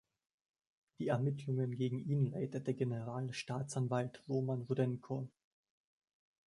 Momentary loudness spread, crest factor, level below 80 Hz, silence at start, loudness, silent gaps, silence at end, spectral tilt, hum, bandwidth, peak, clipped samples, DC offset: 6 LU; 18 dB; -76 dBFS; 1 s; -39 LUFS; none; 1.2 s; -7.5 dB/octave; none; 11 kHz; -20 dBFS; under 0.1%; under 0.1%